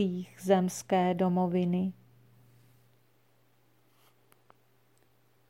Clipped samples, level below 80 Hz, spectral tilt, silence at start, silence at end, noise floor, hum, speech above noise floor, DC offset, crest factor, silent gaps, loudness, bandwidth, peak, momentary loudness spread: under 0.1%; -76 dBFS; -6.5 dB/octave; 0 s; 3.6 s; -69 dBFS; none; 40 dB; under 0.1%; 20 dB; none; -29 LUFS; 15.5 kHz; -12 dBFS; 6 LU